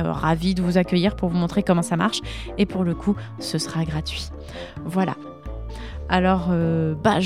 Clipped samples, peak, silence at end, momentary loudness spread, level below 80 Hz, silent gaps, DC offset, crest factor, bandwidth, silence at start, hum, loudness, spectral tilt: under 0.1%; -4 dBFS; 0 s; 15 LU; -38 dBFS; none; 0.2%; 20 dB; 13.5 kHz; 0 s; none; -23 LUFS; -6 dB/octave